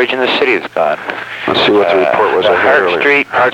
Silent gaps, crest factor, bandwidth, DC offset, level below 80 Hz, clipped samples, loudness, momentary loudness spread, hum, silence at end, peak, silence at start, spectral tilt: none; 12 dB; 14 kHz; under 0.1%; -54 dBFS; under 0.1%; -11 LUFS; 6 LU; none; 0 s; 0 dBFS; 0 s; -5 dB/octave